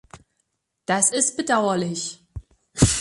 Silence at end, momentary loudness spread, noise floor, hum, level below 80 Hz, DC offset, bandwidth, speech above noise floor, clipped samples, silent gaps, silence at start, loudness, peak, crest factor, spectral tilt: 0 s; 21 LU; -74 dBFS; none; -40 dBFS; under 0.1%; 12 kHz; 52 dB; under 0.1%; none; 0.15 s; -21 LUFS; -2 dBFS; 22 dB; -3.5 dB/octave